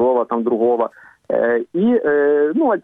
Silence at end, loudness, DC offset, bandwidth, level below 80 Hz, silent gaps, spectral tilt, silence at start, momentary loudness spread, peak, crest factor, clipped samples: 0.05 s; -17 LUFS; under 0.1%; 3.8 kHz; -64 dBFS; none; -9.5 dB/octave; 0 s; 5 LU; -6 dBFS; 10 dB; under 0.1%